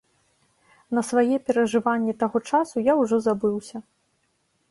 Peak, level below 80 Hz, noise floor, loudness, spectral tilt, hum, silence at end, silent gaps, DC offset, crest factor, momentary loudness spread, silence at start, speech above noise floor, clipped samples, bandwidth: -8 dBFS; -66 dBFS; -70 dBFS; -23 LUFS; -5.5 dB/octave; none; 0.9 s; none; under 0.1%; 16 dB; 7 LU; 0.9 s; 48 dB; under 0.1%; 11.5 kHz